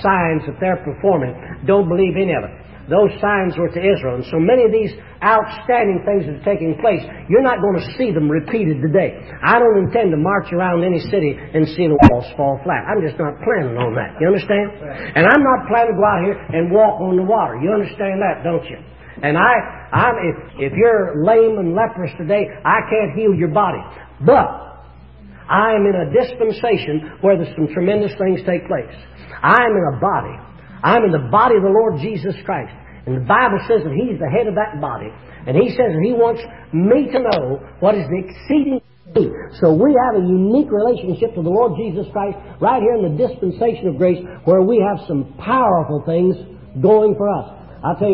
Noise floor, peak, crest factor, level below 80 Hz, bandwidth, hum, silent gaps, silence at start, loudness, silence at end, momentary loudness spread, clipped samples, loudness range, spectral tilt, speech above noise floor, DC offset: -40 dBFS; 0 dBFS; 16 dB; -42 dBFS; 5.8 kHz; none; none; 0 s; -16 LUFS; 0 s; 11 LU; under 0.1%; 3 LU; -10 dB/octave; 24 dB; 0.3%